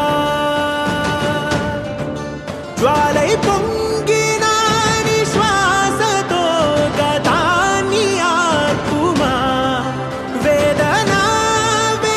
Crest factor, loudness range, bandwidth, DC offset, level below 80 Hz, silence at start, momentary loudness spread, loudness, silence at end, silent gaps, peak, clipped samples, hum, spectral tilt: 14 dB; 3 LU; 15 kHz; under 0.1%; -38 dBFS; 0 s; 7 LU; -15 LUFS; 0 s; none; 0 dBFS; under 0.1%; none; -4 dB/octave